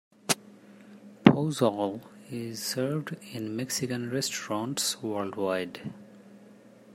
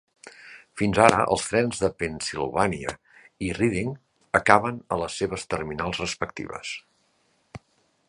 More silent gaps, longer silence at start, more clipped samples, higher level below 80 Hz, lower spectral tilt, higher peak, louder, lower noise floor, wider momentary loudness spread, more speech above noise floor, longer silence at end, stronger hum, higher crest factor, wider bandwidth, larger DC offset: neither; about the same, 0.25 s vs 0.25 s; neither; second, -68 dBFS vs -50 dBFS; about the same, -4.5 dB/octave vs -4.5 dB/octave; about the same, 0 dBFS vs 0 dBFS; second, -29 LUFS vs -25 LUFS; second, -53 dBFS vs -67 dBFS; about the same, 16 LU vs 18 LU; second, 22 dB vs 43 dB; second, 0 s vs 0.5 s; neither; about the same, 30 dB vs 26 dB; first, 16 kHz vs 11.5 kHz; neither